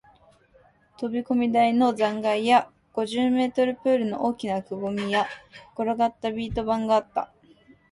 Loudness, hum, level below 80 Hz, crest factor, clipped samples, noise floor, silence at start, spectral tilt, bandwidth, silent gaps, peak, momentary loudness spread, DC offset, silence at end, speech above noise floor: -25 LUFS; none; -54 dBFS; 18 dB; under 0.1%; -59 dBFS; 1 s; -5.5 dB/octave; 11.5 kHz; none; -8 dBFS; 11 LU; under 0.1%; 0.65 s; 35 dB